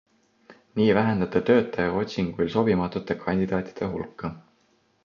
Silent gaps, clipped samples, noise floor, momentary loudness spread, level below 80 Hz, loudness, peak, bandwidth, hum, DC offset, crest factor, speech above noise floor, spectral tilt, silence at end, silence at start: none; under 0.1%; -65 dBFS; 12 LU; -52 dBFS; -25 LUFS; -6 dBFS; 7 kHz; none; under 0.1%; 20 dB; 41 dB; -8 dB/octave; 0.65 s; 0.5 s